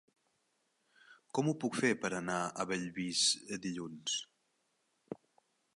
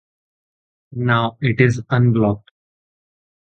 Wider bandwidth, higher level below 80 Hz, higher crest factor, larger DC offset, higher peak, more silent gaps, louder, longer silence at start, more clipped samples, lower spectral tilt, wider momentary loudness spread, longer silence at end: first, 11.5 kHz vs 8 kHz; second, -76 dBFS vs -50 dBFS; about the same, 20 dB vs 20 dB; neither; second, -18 dBFS vs 0 dBFS; neither; second, -35 LUFS vs -18 LUFS; first, 1.1 s vs 0.9 s; neither; second, -3 dB/octave vs -7.5 dB/octave; first, 20 LU vs 10 LU; second, 0.6 s vs 1.05 s